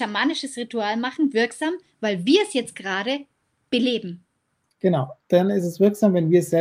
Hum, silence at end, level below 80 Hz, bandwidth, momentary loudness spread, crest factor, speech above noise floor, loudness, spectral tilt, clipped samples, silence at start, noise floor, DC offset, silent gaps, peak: none; 0 s; -70 dBFS; 15.5 kHz; 9 LU; 18 dB; 50 dB; -22 LUFS; -5.5 dB/octave; under 0.1%; 0 s; -72 dBFS; under 0.1%; none; -6 dBFS